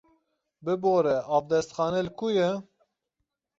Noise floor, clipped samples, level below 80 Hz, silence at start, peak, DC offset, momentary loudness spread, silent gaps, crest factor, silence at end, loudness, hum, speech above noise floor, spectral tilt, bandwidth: -82 dBFS; under 0.1%; -64 dBFS; 0.65 s; -12 dBFS; under 0.1%; 7 LU; none; 16 dB; 0.95 s; -27 LUFS; none; 57 dB; -6 dB/octave; 8 kHz